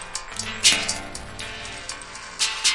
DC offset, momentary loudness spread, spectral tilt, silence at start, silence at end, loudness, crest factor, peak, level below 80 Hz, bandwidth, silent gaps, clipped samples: under 0.1%; 17 LU; 0.5 dB/octave; 0 s; 0 s; -23 LUFS; 24 dB; -2 dBFS; -46 dBFS; 11.5 kHz; none; under 0.1%